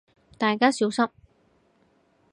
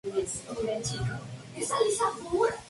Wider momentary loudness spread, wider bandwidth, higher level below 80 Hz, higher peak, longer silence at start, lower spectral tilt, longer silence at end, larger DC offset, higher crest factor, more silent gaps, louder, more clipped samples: about the same, 6 LU vs 8 LU; about the same, 11 kHz vs 11.5 kHz; second, -68 dBFS vs -54 dBFS; first, -4 dBFS vs -14 dBFS; first, 0.4 s vs 0.05 s; about the same, -4 dB/octave vs -4 dB/octave; first, 1.25 s vs 0 s; neither; first, 22 dB vs 16 dB; neither; first, -24 LUFS vs -30 LUFS; neither